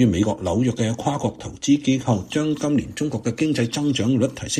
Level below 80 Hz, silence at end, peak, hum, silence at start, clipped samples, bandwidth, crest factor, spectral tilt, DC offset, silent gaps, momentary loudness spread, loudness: -48 dBFS; 0 s; -6 dBFS; none; 0 s; under 0.1%; 13 kHz; 16 dB; -5.5 dB/octave; under 0.1%; none; 6 LU; -22 LUFS